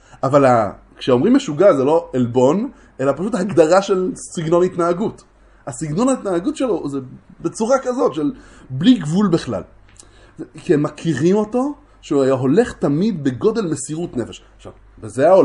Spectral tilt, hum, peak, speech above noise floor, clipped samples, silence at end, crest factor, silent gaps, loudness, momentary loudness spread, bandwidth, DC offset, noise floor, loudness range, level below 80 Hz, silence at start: -6.5 dB/octave; none; 0 dBFS; 28 dB; under 0.1%; 0 s; 18 dB; none; -18 LUFS; 15 LU; 11.5 kHz; under 0.1%; -45 dBFS; 5 LU; -50 dBFS; 0.25 s